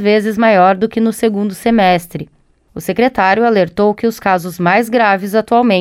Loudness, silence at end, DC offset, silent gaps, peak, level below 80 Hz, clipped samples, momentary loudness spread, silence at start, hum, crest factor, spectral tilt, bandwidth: -13 LUFS; 0 s; under 0.1%; none; 0 dBFS; -48 dBFS; under 0.1%; 9 LU; 0 s; none; 12 dB; -6 dB/octave; 16 kHz